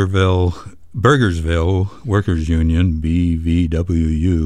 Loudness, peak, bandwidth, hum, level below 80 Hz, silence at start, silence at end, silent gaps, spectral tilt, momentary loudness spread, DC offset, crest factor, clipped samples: -17 LUFS; -2 dBFS; 9.8 kHz; none; -26 dBFS; 0 s; 0 s; none; -7.5 dB/octave; 4 LU; 1%; 14 dB; under 0.1%